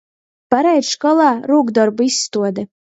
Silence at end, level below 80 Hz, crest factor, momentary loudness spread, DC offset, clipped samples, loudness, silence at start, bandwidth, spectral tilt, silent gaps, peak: 0.25 s; -66 dBFS; 16 dB; 7 LU; under 0.1%; under 0.1%; -15 LUFS; 0.5 s; 8.2 kHz; -3.5 dB/octave; none; 0 dBFS